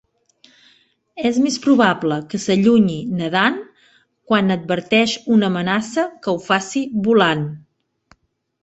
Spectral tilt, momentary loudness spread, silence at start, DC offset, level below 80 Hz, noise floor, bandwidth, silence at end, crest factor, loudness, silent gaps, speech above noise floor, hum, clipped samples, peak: -5 dB/octave; 9 LU; 1.15 s; under 0.1%; -58 dBFS; -57 dBFS; 8.2 kHz; 1.05 s; 18 dB; -18 LUFS; none; 40 dB; none; under 0.1%; -2 dBFS